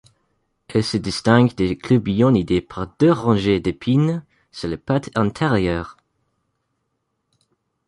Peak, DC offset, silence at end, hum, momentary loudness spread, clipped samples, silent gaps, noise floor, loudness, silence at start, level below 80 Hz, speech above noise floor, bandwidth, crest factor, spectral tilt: -2 dBFS; under 0.1%; 1.95 s; none; 12 LU; under 0.1%; none; -73 dBFS; -19 LUFS; 0.7 s; -44 dBFS; 55 dB; 11.5 kHz; 18 dB; -7 dB/octave